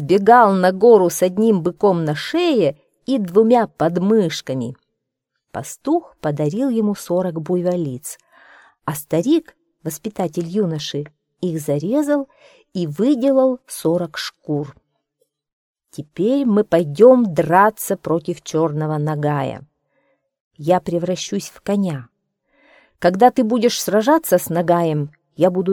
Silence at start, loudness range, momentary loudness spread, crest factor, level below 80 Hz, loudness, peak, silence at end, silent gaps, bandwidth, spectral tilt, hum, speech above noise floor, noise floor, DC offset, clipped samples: 0 s; 7 LU; 15 LU; 18 dB; -60 dBFS; -18 LUFS; 0 dBFS; 0 s; 15.53-15.75 s, 20.40-20.51 s; 18.5 kHz; -6 dB/octave; none; 60 dB; -77 dBFS; under 0.1%; under 0.1%